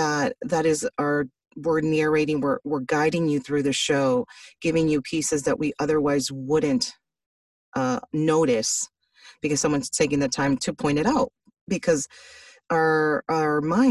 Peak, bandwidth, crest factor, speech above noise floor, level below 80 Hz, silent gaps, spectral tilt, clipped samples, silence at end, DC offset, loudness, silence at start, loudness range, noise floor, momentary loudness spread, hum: -8 dBFS; 12.5 kHz; 16 dB; 30 dB; -56 dBFS; 7.26-7.72 s, 11.61-11.67 s; -4.5 dB/octave; under 0.1%; 0 s; under 0.1%; -24 LUFS; 0 s; 2 LU; -53 dBFS; 6 LU; none